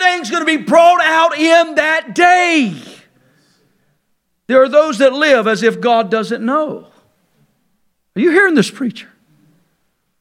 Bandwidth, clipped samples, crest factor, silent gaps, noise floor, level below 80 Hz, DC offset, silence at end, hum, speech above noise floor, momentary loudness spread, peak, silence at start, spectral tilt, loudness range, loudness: 13 kHz; under 0.1%; 14 dB; none; -65 dBFS; -66 dBFS; under 0.1%; 1.2 s; none; 53 dB; 11 LU; 0 dBFS; 0 s; -4 dB/octave; 6 LU; -12 LUFS